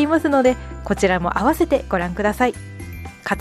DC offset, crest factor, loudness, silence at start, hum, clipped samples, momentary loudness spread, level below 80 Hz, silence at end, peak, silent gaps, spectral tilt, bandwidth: under 0.1%; 16 dB; -19 LUFS; 0 s; none; under 0.1%; 17 LU; -36 dBFS; 0 s; -4 dBFS; none; -6 dB/octave; 15.5 kHz